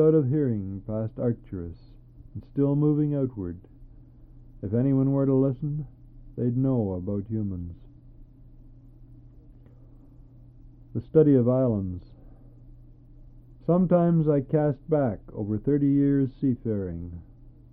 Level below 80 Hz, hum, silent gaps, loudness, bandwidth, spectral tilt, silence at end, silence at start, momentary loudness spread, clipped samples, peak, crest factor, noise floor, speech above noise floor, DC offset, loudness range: -50 dBFS; none; none; -25 LUFS; 3.5 kHz; -14 dB/octave; 0.25 s; 0 s; 16 LU; under 0.1%; -8 dBFS; 20 dB; -50 dBFS; 25 dB; under 0.1%; 7 LU